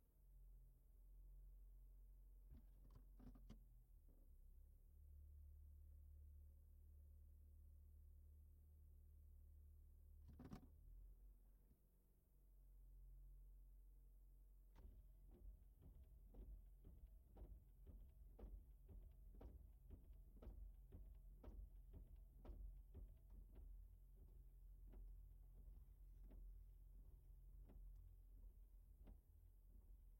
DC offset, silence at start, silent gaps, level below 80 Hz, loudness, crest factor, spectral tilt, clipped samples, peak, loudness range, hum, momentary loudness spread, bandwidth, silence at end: under 0.1%; 0 s; none; -64 dBFS; -67 LUFS; 18 dB; -7.5 dB/octave; under 0.1%; -46 dBFS; 4 LU; none; 5 LU; 16.5 kHz; 0 s